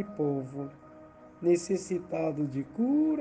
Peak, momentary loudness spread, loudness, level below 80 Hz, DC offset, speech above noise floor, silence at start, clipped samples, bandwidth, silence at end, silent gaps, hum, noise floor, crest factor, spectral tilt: -14 dBFS; 11 LU; -31 LUFS; -68 dBFS; under 0.1%; 22 dB; 0 s; under 0.1%; 9.4 kHz; 0 s; none; none; -52 dBFS; 16 dB; -7 dB/octave